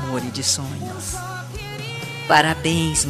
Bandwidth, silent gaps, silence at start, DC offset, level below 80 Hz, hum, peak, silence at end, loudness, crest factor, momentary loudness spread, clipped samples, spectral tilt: 15.5 kHz; none; 0 s; under 0.1%; -42 dBFS; none; 0 dBFS; 0 s; -22 LUFS; 22 dB; 14 LU; under 0.1%; -3 dB/octave